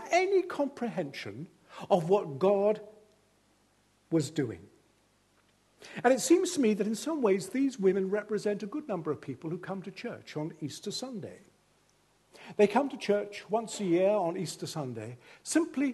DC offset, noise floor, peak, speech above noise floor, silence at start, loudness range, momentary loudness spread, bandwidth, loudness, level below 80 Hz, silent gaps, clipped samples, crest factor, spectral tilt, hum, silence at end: under 0.1%; -68 dBFS; -10 dBFS; 38 dB; 0 s; 9 LU; 15 LU; 12.5 kHz; -31 LUFS; -76 dBFS; none; under 0.1%; 22 dB; -5 dB/octave; 50 Hz at -70 dBFS; 0 s